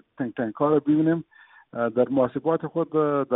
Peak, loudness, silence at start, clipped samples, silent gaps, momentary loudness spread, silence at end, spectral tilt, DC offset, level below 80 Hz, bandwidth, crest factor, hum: -8 dBFS; -24 LUFS; 0.2 s; under 0.1%; none; 8 LU; 0 s; -8 dB/octave; under 0.1%; -66 dBFS; 3.9 kHz; 16 dB; none